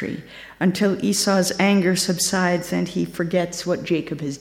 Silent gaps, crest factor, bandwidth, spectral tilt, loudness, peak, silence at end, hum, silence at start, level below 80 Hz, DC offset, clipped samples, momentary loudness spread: none; 16 dB; 16.5 kHz; -4.5 dB/octave; -21 LUFS; -6 dBFS; 0 s; none; 0 s; -56 dBFS; under 0.1%; under 0.1%; 7 LU